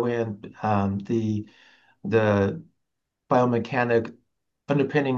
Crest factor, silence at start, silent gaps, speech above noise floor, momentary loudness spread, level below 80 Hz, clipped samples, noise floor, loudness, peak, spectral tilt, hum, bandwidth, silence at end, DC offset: 18 dB; 0 s; none; 57 dB; 12 LU; -66 dBFS; under 0.1%; -81 dBFS; -25 LUFS; -8 dBFS; -8 dB/octave; none; 7.2 kHz; 0 s; under 0.1%